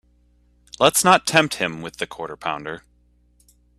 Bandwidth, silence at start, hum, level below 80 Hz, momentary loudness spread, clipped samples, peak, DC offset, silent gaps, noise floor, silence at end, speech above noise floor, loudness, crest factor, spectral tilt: 15.5 kHz; 0.8 s; 60 Hz at -50 dBFS; -56 dBFS; 15 LU; under 0.1%; 0 dBFS; under 0.1%; none; -59 dBFS; 1 s; 39 dB; -20 LUFS; 22 dB; -2.5 dB/octave